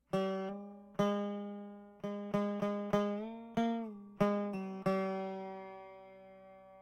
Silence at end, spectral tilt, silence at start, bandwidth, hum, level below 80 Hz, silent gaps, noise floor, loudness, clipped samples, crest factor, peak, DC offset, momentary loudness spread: 0 s; -7.5 dB/octave; 0.1 s; 12 kHz; none; -68 dBFS; none; -57 dBFS; -37 LUFS; under 0.1%; 18 dB; -20 dBFS; under 0.1%; 18 LU